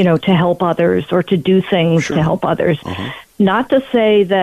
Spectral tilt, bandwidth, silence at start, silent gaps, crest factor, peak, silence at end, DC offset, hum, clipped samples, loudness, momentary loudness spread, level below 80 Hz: -7 dB/octave; 13.5 kHz; 0 s; none; 10 dB; -4 dBFS; 0 s; under 0.1%; none; under 0.1%; -14 LUFS; 5 LU; -46 dBFS